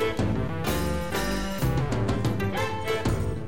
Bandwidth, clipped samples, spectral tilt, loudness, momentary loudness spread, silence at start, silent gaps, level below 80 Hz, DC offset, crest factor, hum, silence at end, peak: 17 kHz; under 0.1%; -6 dB/octave; -27 LUFS; 2 LU; 0 s; none; -36 dBFS; 1%; 10 dB; none; 0 s; -16 dBFS